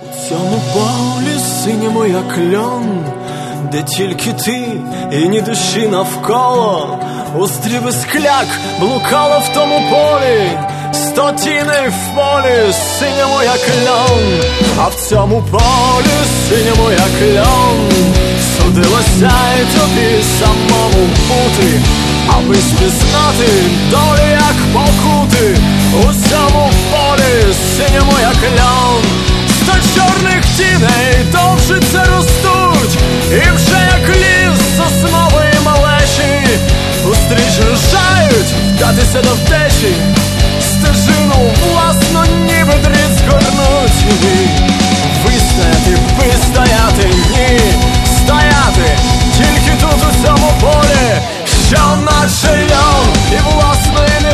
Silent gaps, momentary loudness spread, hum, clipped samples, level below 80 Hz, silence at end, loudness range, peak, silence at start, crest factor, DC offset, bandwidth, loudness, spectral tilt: none; 6 LU; none; 0.1%; -16 dBFS; 0 s; 5 LU; 0 dBFS; 0 s; 10 dB; under 0.1%; 14 kHz; -10 LUFS; -4.5 dB/octave